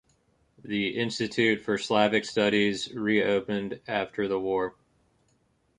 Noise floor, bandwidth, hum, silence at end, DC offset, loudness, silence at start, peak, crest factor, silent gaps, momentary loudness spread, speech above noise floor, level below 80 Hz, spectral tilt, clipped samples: -69 dBFS; 10.5 kHz; none; 1.1 s; under 0.1%; -27 LUFS; 0.65 s; -8 dBFS; 20 dB; none; 8 LU; 42 dB; -64 dBFS; -5 dB/octave; under 0.1%